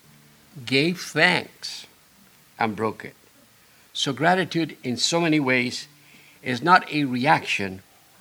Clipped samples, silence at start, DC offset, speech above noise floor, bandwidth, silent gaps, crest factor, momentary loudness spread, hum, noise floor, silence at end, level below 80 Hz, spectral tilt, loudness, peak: under 0.1%; 0.55 s; under 0.1%; 32 dB; over 20 kHz; none; 24 dB; 16 LU; none; -55 dBFS; 0.4 s; -70 dBFS; -4 dB/octave; -22 LUFS; -2 dBFS